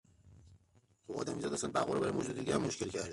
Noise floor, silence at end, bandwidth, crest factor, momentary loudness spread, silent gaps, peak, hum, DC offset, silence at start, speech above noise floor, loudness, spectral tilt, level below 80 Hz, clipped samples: -70 dBFS; 0 s; 11.5 kHz; 18 dB; 6 LU; none; -20 dBFS; none; under 0.1%; 0.25 s; 34 dB; -37 LUFS; -4.5 dB/octave; -64 dBFS; under 0.1%